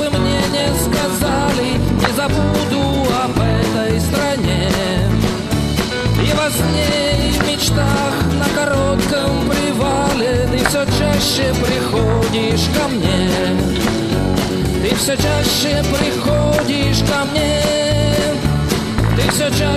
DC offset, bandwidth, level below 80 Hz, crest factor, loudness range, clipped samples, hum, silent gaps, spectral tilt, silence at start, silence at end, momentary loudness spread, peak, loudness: under 0.1%; 14 kHz; -26 dBFS; 16 dB; 1 LU; under 0.1%; none; none; -5 dB/octave; 0 s; 0 s; 2 LU; 0 dBFS; -16 LUFS